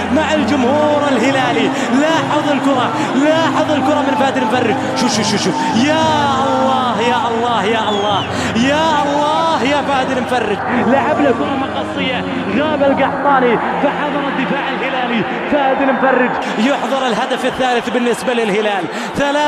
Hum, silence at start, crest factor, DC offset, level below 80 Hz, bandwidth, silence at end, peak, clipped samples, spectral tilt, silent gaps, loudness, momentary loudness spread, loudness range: none; 0 s; 14 dB; under 0.1%; -50 dBFS; 13.5 kHz; 0 s; 0 dBFS; under 0.1%; -4.5 dB/octave; none; -15 LUFS; 4 LU; 1 LU